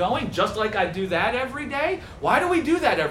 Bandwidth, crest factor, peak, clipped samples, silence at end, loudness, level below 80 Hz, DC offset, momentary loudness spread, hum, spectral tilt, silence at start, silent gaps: 16 kHz; 18 dB; -6 dBFS; under 0.1%; 0 s; -23 LUFS; -48 dBFS; under 0.1%; 6 LU; none; -5 dB/octave; 0 s; none